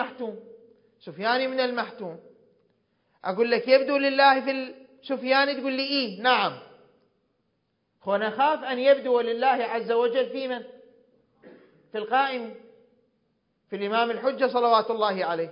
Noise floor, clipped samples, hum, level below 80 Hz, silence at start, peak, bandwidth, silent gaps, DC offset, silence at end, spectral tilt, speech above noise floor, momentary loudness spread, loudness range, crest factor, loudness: -74 dBFS; under 0.1%; none; -82 dBFS; 0 s; -6 dBFS; 5.4 kHz; none; under 0.1%; 0 s; -8 dB/octave; 50 dB; 16 LU; 8 LU; 20 dB; -24 LUFS